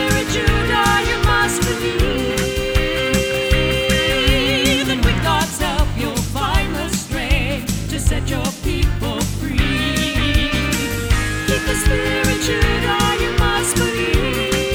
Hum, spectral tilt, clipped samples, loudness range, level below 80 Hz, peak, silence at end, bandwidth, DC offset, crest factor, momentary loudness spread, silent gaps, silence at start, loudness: none; -4 dB/octave; under 0.1%; 4 LU; -24 dBFS; -2 dBFS; 0 s; over 20 kHz; under 0.1%; 16 dB; 6 LU; none; 0 s; -18 LUFS